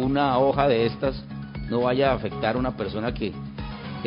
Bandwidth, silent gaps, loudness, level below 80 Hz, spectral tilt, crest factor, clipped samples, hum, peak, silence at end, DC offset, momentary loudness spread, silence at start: 5.4 kHz; none; -24 LUFS; -42 dBFS; -11 dB/octave; 18 dB; under 0.1%; none; -6 dBFS; 0 s; under 0.1%; 14 LU; 0 s